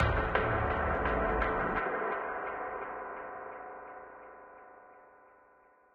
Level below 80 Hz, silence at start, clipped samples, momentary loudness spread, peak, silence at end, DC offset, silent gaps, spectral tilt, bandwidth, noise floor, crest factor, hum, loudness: -44 dBFS; 0 s; under 0.1%; 21 LU; -14 dBFS; 0.9 s; under 0.1%; none; -8.5 dB/octave; 5.4 kHz; -63 dBFS; 22 dB; none; -33 LUFS